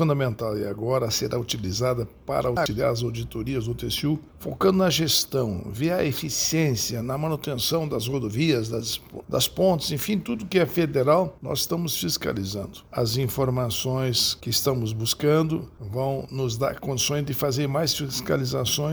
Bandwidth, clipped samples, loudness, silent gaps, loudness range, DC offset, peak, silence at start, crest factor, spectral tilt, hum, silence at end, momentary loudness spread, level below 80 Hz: over 20 kHz; under 0.1%; -25 LUFS; none; 2 LU; under 0.1%; -6 dBFS; 0 s; 18 dB; -4.5 dB/octave; none; 0 s; 7 LU; -48 dBFS